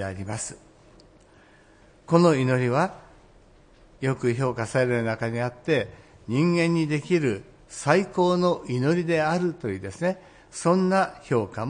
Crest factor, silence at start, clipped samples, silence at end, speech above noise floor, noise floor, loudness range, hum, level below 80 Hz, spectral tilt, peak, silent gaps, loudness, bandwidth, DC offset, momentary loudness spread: 22 dB; 0 s; under 0.1%; 0 s; 31 dB; -54 dBFS; 3 LU; none; -58 dBFS; -6.5 dB/octave; -4 dBFS; none; -24 LUFS; 10.5 kHz; under 0.1%; 11 LU